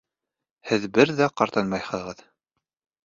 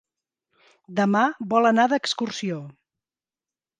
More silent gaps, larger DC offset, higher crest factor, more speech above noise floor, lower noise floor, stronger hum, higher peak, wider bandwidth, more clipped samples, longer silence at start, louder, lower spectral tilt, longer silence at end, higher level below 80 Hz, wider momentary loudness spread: neither; neither; about the same, 22 dB vs 20 dB; second, 64 dB vs over 68 dB; about the same, -87 dBFS vs under -90 dBFS; neither; about the same, -4 dBFS vs -6 dBFS; second, 7.6 kHz vs 9.6 kHz; neither; second, 0.65 s vs 0.9 s; about the same, -23 LUFS vs -22 LUFS; about the same, -5.5 dB/octave vs -5 dB/octave; second, 0.9 s vs 1.1 s; first, -62 dBFS vs -76 dBFS; first, 19 LU vs 12 LU